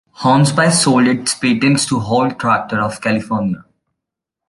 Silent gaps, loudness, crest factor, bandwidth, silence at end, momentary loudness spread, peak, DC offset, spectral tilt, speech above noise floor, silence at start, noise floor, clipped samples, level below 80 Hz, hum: none; -15 LUFS; 16 dB; 11.5 kHz; 0.9 s; 8 LU; 0 dBFS; under 0.1%; -4.5 dB/octave; 67 dB; 0.2 s; -81 dBFS; under 0.1%; -52 dBFS; none